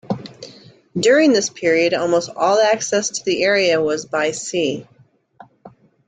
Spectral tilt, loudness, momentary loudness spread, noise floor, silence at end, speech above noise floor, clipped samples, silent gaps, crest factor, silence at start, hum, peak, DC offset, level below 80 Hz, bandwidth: -3.5 dB/octave; -17 LUFS; 15 LU; -47 dBFS; 0.4 s; 30 dB; under 0.1%; none; 16 dB; 0.1 s; none; -2 dBFS; under 0.1%; -62 dBFS; 9.4 kHz